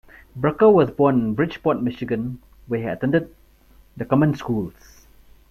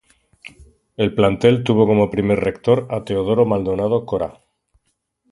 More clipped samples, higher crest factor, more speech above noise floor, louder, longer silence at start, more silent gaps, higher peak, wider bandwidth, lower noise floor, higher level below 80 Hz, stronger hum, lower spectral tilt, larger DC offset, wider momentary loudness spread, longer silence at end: neither; about the same, 18 dB vs 18 dB; second, 32 dB vs 52 dB; second, -21 LUFS vs -18 LUFS; about the same, 0.35 s vs 0.45 s; neither; second, -4 dBFS vs 0 dBFS; first, 14 kHz vs 11.5 kHz; second, -52 dBFS vs -69 dBFS; about the same, -50 dBFS vs -46 dBFS; neither; about the same, -9 dB/octave vs -8 dB/octave; neither; first, 18 LU vs 9 LU; second, 0.8 s vs 1 s